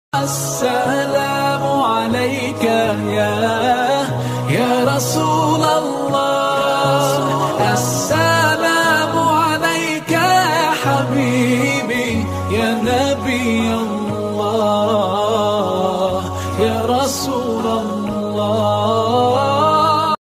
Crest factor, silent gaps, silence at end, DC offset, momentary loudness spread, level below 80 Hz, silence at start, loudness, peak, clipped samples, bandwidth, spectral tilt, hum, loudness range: 14 dB; none; 0.15 s; under 0.1%; 6 LU; -48 dBFS; 0.15 s; -16 LUFS; -2 dBFS; under 0.1%; 15.5 kHz; -4.5 dB/octave; none; 3 LU